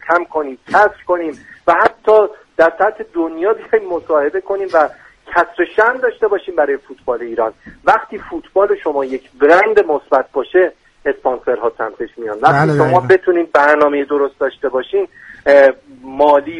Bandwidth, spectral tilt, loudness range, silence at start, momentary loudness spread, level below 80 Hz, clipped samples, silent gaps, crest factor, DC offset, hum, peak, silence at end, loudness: 10 kHz; -7 dB/octave; 3 LU; 0.05 s; 11 LU; -52 dBFS; under 0.1%; none; 14 dB; under 0.1%; none; 0 dBFS; 0 s; -14 LUFS